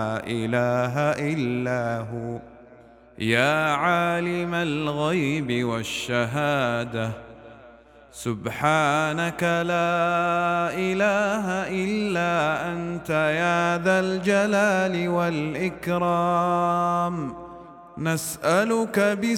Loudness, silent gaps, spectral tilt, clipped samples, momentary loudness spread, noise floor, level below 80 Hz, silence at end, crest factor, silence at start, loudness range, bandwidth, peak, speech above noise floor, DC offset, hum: -24 LUFS; none; -5.5 dB/octave; under 0.1%; 9 LU; -50 dBFS; -56 dBFS; 0 s; 20 dB; 0 s; 3 LU; 17 kHz; -4 dBFS; 26 dB; under 0.1%; none